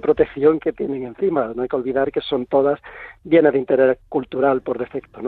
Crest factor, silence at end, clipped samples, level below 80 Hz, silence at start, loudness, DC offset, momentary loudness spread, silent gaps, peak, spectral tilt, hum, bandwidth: 16 dB; 0 s; under 0.1%; -52 dBFS; 0.05 s; -20 LUFS; under 0.1%; 10 LU; none; -2 dBFS; -9.5 dB/octave; none; 4.6 kHz